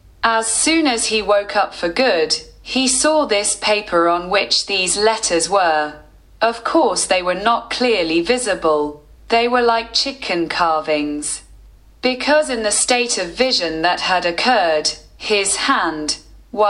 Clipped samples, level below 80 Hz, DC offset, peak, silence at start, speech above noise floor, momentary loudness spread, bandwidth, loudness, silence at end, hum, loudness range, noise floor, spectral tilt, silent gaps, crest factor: under 0.1%; -46 dBFS; under 0.1%; 0 dBFS; 0.2 s; 27 dB; 7 LU; 12 kHz; -17 LUFS; 0 s; none; 2 LU; -44 dBFS; -1.5 dB/octave; none; 18 dB